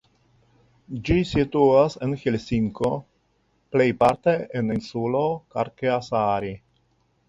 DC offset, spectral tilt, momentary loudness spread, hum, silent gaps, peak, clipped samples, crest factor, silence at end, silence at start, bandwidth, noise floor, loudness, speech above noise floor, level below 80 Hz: under 0.1%; -7.5 dB/octave; 10 LU; none; none; -4 dBFS; under 0.1%; 18 dB; 0.7 s; 0.9 s; 11 kHz; -67 dBFS; -23 LUFS; 45 dB; -46 dBFS